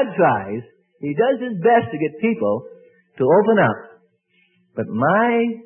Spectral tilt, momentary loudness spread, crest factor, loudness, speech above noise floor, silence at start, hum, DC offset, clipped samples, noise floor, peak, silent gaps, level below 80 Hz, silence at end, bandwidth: -12 dB/octave; 14 LU; 16 dB; -19 LUFS; 44 dB; 0 s; none; under 0.1%; under 0.1%; -62 dBFS; -4 dBFS; none; -64 dBFS; 0.05 s; 3.5 kHz